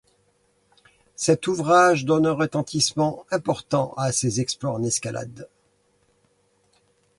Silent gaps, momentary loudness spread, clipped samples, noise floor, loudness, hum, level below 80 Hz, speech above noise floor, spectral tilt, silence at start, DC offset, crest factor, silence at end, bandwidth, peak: none; 10 LU; under 0.1%; -65 dBFS; -22 LUFS; none; -60 dBFS; 43 dB; -4.5 dB/octave; 1.2 s; under 0.1%; 18 dB; 1.7 s; 11.5 kHz; -6 dBFS